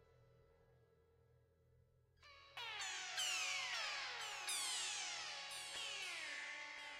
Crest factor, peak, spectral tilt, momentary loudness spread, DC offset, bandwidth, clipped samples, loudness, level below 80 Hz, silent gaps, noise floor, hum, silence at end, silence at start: 18 dB; -30 dBFS; 2 dB/octave; 8 LU; under 0.1%; 16 kHz; under 0.1%; -44 LUFS; -82 dBFS; none; -74 dBFS; none; 0 s; 0 s